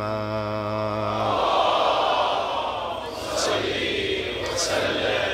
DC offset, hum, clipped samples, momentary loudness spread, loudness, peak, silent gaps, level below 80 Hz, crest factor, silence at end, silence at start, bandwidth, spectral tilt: under 0.1%; none; under 0.1%; 7 LU; -24 LUFS; -8 dBFS; none; -48 dBFS; 16 dB; 0 s; 0 s; 16 kHz; -3.5 dB/octave